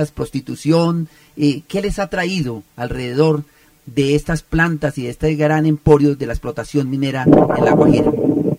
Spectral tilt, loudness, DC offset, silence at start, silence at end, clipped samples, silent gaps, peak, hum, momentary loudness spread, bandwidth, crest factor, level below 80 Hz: -7 dB/octave; -17 LUFS; under 0.1%; 0 s; 0 s; under 0.1%; none; 0 dBFS; none; 12 LU; 15.5 kHz; 16 dB; -36 dBFS